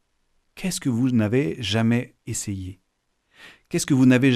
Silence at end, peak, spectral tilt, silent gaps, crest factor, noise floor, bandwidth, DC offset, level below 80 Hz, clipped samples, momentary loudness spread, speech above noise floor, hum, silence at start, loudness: 0 s; -6 dBFS; -5.5 dB/octave; none; 18 dB; -72 dBFS; 14.5 kHz; under 0.1%; -56 dBFS; under 0.1%; 14 LU; 50 dB; none; 0.55 s; -23 LUFS